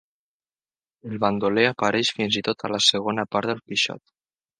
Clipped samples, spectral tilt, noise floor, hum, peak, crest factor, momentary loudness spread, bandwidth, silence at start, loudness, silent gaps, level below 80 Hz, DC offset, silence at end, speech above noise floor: under 0.1%; -3.5 dB/octave; under -90 dBFS; none; -2 dBFS; 24 dB; 7 LU; 10 kHz; 1.05 s; -22 LUFS; none; -64 dBFS; under 0.1%; 0.6 s; over 67 dB